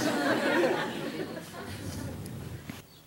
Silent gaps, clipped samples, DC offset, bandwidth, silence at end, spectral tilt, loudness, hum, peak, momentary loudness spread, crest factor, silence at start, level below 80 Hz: none; under 0.1%; under 0.1%; 16 kHz; 0.05 s; -4.5 dB/octave; -32 LUFS; none; -14 dBFS; 15 LU; 18 dB; 0 s; -58 dBFS